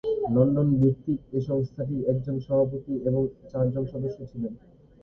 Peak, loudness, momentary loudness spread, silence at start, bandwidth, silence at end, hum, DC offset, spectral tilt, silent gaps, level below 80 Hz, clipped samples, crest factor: -8 dBFS; -27 LUFS; 12 LU; 0.05 s; 5.6 kHz; 0.45 s; none; under 0.1%; -12 dB/octave; none; -52 dBFS; under 0.1%; 18 dB